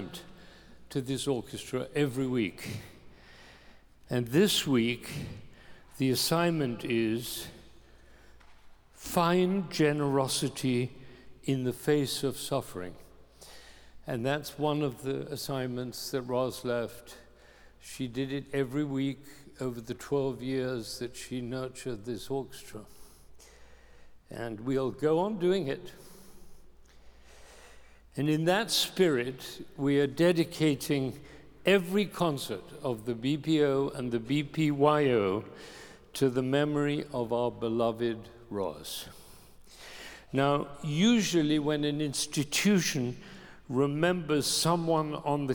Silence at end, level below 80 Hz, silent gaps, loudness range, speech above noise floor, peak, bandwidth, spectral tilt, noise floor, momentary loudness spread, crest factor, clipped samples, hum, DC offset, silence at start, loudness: 0 s; -58 dBFS; none; 7 LU; 26 dB; -10 dBFS; over 20 kHz; -5 dB/octave; -56 dBFS; 17 LU; 20 dB; under 0.1%; none; under 0.1%; 0 s; -30 LUFS